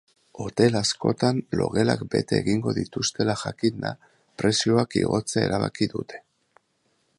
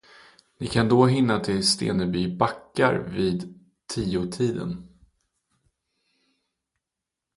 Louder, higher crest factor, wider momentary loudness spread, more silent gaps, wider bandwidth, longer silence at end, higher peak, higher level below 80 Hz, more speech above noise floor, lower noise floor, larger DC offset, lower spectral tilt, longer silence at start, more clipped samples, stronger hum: about the same, -24 LUFS vs -24 LUFS; about the same, 20 dB vs 22 dB; second, 11 LU vs 14 LU; neither; about the same, 11.5 kHz vs 11.5 kHz; second, 1 s vs 2.5 s; about the same, -4 dBFS vs -4 dBFS; about the same, -54 dBFS vs -52 dBFS; second, 46 dB vs 63 dB; second, -70 dBFS vs -86 dBFS; neither; about the same, -5 dB/octave vs -5.5 dB/octave; second, 0.35 s vs 0.6 s; neither; neither